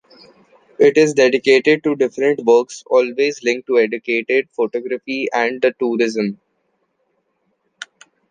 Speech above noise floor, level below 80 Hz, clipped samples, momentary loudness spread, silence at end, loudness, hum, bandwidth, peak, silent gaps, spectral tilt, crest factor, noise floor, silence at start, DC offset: 51 dB; -70 dBFS; under 0.1%; 11 LU; 0.45 s; -17 LUFS; none; 9.6 kHz; -2 dBFS; none; -4.5 dB/octave; 16 dB; -67 dBFS; 0.8 s; under 0.1%